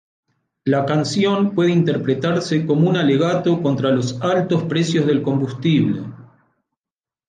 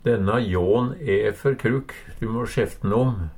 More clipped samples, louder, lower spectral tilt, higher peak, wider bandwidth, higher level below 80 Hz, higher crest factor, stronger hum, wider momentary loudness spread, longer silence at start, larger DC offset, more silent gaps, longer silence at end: neither; first, -18 LUFS vs -23 LUFS; about the same, -6.5 dB/octave vs -7.5 dB/octave; about the same, -6 dBFS vs -8 dBFS; second, 9.6 kHz vs 16.5 kHz; second, -60 dBFS vs -42 dBFS; about the same, 14 dB vs 14 dB; neither; second, 4 LU vs 7 LU; first, 0.65 s vs 0.05 s; neither; neither; first, 1.05 s vs 0 s